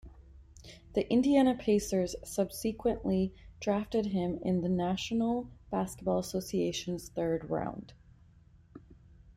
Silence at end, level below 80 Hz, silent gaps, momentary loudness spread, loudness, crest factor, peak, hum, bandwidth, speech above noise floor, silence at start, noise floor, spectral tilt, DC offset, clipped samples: 0.05 s; -54 dBFS; none; 10 LU; -32 LUFS; 18 dB; -14 dBFS; none; 16 kHz; 28 dB; 0.05 s; -59 dBFS; -6 dB/octave; under 0.1%; under 0.1%